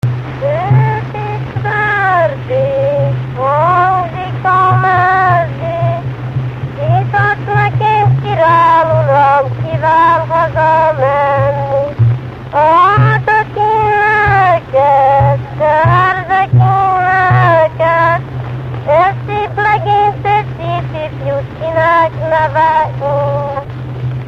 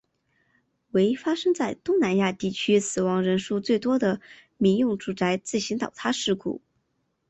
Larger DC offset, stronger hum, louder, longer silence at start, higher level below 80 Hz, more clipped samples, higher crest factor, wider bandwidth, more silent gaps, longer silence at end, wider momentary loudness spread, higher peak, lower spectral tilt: neither; neither; first, -12 LUFS vs -25 LUFS; second, 0.05 s vs 0.95 s; first, -36 dBFS vs -64 dBFS; neither; about the same, 12 dB vs 16 dB; second, 6.2 kHz vs 8.4 kHz; neither; second, 0 s vs 0.7 s; first, 10 LU vs 6 LU; first, 0 dBFS vs -10 dBFS; first, -8 dB/octave vs -5 dB/octave